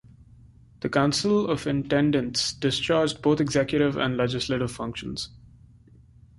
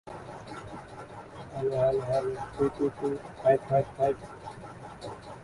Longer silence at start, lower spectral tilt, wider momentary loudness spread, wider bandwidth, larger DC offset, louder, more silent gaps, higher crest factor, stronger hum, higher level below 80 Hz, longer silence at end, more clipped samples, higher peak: first, 0.8 s vs 0.05 s; second, -5 dB/octave vs -7.5 dB/octave; second, 10 LU vs 18 LU; about the same, 11.5 kHz vs 11.5 kHz; neither; first, -25 LUFS vs -29 LUFS; neither; about the same, 18 dB vs 20 dB; neither; about the same, -52 dBFS vs -56 dBFS; first, 1.05 s vs 0 s; neither; first, -8 dBFS vs -12 dBFS